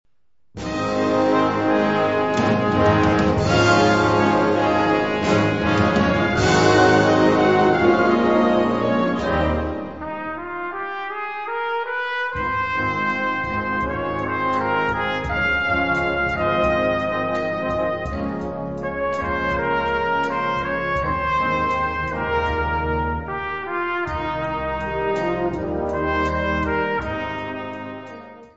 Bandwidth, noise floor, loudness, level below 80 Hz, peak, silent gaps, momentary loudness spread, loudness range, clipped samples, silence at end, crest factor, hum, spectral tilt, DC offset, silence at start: 8 kHz; -66 dBFS; -20 LUFS; -38 dBFS; -2 dBFS; none; 11 LU; 7 LU; under 0.1%; 0.05 s; 18 dB; none; -6 dB/octave; 0.4%; 0.55 s